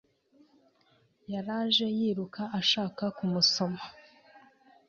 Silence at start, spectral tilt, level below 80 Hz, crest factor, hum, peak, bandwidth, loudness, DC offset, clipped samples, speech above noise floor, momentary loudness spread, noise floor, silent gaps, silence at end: 1.3 s; -4 dB/octave; -72 dBFS; 20 dB; none; -12 dBFS; 7.4 kHz; -29 LUFS; under 0.1%; under 0.1%; 38 dB; 13 LU; -67 dBFS; none; 0.5 s